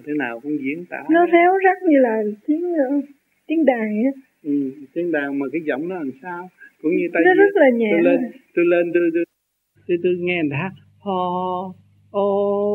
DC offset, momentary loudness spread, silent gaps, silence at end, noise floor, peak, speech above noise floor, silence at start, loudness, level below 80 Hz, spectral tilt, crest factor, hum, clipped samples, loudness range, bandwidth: under 0.1%; 14 LU; none; 0 s; -68 dBFS; -2 dBFS; 49 dB; 0.05 s; -19 LUFS; -76 dBFS; -8.5 dB/octave; 18 dB; none; under 0.1%; 6 LU; 4 kHz